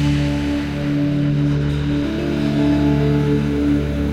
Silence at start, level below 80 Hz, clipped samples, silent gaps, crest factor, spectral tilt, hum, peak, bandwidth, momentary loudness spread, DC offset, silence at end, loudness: 0 s; -30 dBFS; under 0.1%; none; 12 dB; -8 dB/octave; none; -6 dBFS; 11 kHz; 4 LU; under 0.1%; 0 s; -18 LUFS